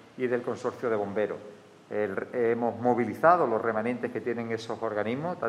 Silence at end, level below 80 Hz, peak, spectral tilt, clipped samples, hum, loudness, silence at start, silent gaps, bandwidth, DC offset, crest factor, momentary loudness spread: 0 s; -76 dBFS; -8 dBFS; -7 dB/octave; under 0.1%; none; -28 LUFS; 0.15 s; none; 13 kHz; under 0.1%; 20 dB; 10 LU